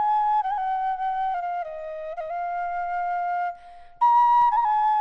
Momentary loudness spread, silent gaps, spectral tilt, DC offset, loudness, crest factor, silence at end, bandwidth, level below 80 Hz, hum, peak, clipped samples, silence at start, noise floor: 14 LU; none; -2.5 dB/octave; under 0.1%; -24 LUFS; 12 dB; 0 s; 6.2 kHz; -56 dBFS; none; -12 dBFS; under 0.1%; 0 s; -44 dBFS